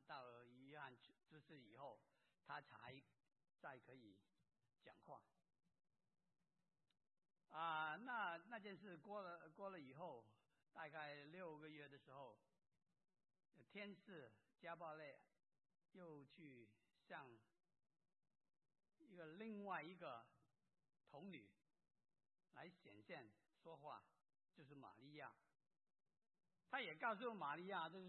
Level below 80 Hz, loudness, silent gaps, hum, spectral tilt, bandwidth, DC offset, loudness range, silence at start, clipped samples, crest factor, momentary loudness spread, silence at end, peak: under -90 dBFS; -56 LUFS; none; none; -2.5 dB/octave; 4.2 kHz; under 0.1%; 13 LU; 0 s; under 0.1%; 24 dB; 17 LU; 0 s; -34 dBFS